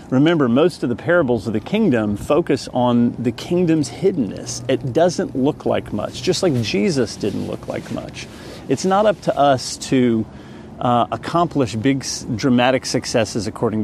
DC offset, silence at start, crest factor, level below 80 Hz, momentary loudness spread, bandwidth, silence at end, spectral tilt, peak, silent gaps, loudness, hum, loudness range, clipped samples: under 0.1%; 0 s; 18 dB; -48 dBFS; 10 LU; 13.5 kHz; 0 s; -5.5 dB/octave; 0 dBFS; none; -19 LUFS; none; 2 LU; under 0.1%